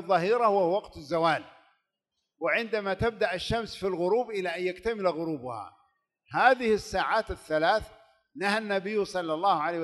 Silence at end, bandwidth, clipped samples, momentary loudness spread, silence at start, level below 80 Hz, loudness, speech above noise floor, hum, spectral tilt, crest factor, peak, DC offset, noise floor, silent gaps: 0 s; 12 kHz; under 0.1%; 9 LU; 0 s; -54 dBFS; -28 LUFS; 56 dB; none; -5 dB/octave; 20 dB; -8 dBFS; under 0.1%; -83 dBFS; none